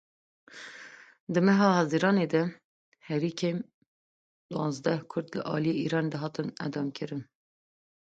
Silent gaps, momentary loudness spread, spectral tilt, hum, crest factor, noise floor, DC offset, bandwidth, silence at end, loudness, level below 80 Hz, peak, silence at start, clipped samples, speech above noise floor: 1.20-1.27 s, 2.64-2.92 s, 3.74-4.49 s; 20 LU; -6.5 dB/octave; none; 20 dB; -50 dBFS; under 0.1%; 8 kHz; 0.95 s; -29 LUFS; -72 dBFS; -10 dBFS; 0.5 s; under 0.1%; 22 dB